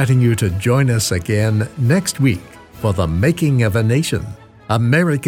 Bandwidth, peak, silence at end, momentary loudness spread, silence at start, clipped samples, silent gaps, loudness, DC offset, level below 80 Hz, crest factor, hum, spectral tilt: 16 kHz; -2 dBFS; 0 s; 7 LU; 0 s; under 0.1%; none; -17 LUFS; under 0.1%; -40 dBFS; 14 dB; none; -6 dB/octave